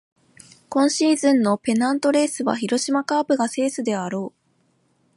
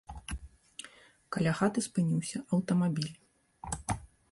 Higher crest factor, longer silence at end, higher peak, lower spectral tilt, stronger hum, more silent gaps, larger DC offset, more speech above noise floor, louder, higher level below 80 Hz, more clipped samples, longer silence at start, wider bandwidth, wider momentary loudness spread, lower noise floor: about the same, 16 dB vs 18 dB; first, 0.9 s vs 0.25 s; first, -6 dBFS vs -16 dBFS; second, -4 dB/octave vs -5.5 dB/octave; neither; neither; neither; first, 44 dB vs 26 dB; first, -21 LUFS vs -33 LUFS; second, -72 dBFS vs -52 dBFS; neither; first, 0.7 s vs 0.1 s; about the same, 11.5 kHz vs 11.5 kHz; second, 8 LU vs 18 LU; first, -65 dBFS vs -56 dBFS